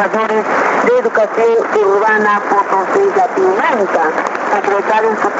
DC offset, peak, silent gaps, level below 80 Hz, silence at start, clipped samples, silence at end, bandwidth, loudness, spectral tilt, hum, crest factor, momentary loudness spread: under 0.1%; 0 dBFS; none; -64 dBFS; 0 s; under 0.1%; 0 s; 8 kHz; -13 LUFS; -5 dB/octave; none; 12 dB; 3 LU